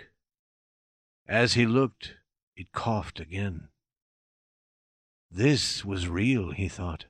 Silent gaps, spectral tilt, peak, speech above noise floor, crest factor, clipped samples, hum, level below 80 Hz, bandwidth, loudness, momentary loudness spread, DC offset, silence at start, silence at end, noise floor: 0.39-1.26 s, 2.43-2.52 s, 4.02-5.29 s; -5 dB/octave; -10 dBFS; over 63 dB; 20 dB; under 0.1%; none; -52 dBFS; 13 kHz; -27 LUFS; 20 LU; under 0.1%; 0 s; 0.05 s; under -90 dBFS